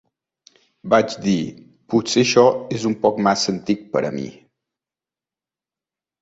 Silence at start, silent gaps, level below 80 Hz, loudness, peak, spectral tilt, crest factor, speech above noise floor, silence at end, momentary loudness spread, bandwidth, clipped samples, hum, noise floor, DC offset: 0.85 s; none; -60 dBFS; -19 LUFS; -2 dBFS; -4.5 dB/octave; 20 dB; over 71 dB; 1.9 s; 13 LU; 8 kHz; under 0.1%; none; under -90 dBFS; under 0.1%